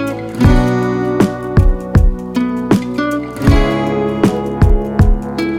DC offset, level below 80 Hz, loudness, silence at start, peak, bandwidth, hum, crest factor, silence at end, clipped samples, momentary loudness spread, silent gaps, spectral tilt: under 0.1%; -18 dBFS; -15 LUFS; 0 s; 0 dBFS; 14.5 kHz; none; 12 dB; 0 s; under 0.1%; 6 LU; none; -7.5 dB/octave